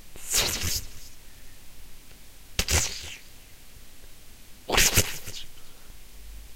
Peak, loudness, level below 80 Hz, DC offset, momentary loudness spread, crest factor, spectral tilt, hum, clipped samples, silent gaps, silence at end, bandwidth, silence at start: -4 dBFS; -25 LUFS; -40 dBFS; under 0.1%; 26 LU; 26 dB; -1.5 dB/octave; none; under 0.1%; none; 0 s; 16 kHz; 0 s